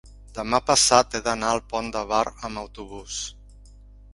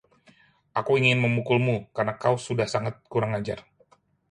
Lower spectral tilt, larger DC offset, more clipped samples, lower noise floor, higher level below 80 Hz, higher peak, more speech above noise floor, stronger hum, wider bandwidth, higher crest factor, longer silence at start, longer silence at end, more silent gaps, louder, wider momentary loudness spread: second, -2 dB/octave vs -6 dB/octave; neither; neither; second, -47 dBFS vs -62 dBFS; first, -46 dBFS vs -60 dBFS; first, 0 dBFS vs -8 dBFS; second, 23 dB vs 37 dB; first, 50 Hz at -45 dBFS vs none; about the same, 11.5 kHz vs 10.5 kHz; about the same, 24 dB vs 20 dB; second, 0.05 s vs 0.75 s; second, 0.45 s vs 0.7 s; neither; about the same, -23 LUFS vs -25 LUFS; first, 19 LU vs 10 LU